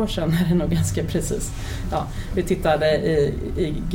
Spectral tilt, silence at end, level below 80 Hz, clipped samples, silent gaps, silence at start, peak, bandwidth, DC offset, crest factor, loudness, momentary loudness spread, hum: -6 dB/octave; 0 s; -32 dBFS; under 0.1%; none; 0 s; -8 dBFS; 17 kHz; under 0.1%; 14 dB; -22 LUFS; 8 LU; none